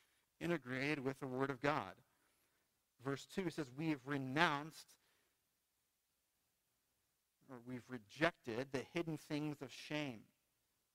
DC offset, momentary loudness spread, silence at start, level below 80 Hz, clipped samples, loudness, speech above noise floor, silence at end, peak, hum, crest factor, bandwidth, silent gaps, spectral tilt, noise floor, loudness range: under 0.1%; 15 LU; 0.4 s; -78 dBFS; under 0.1%; -43 LUFS; 43 dB; 0.7 s; -16 dBFS; none; 30 dB; 16 kHz; none; -5.5 dB/octave; -86 dBFS; 6 LU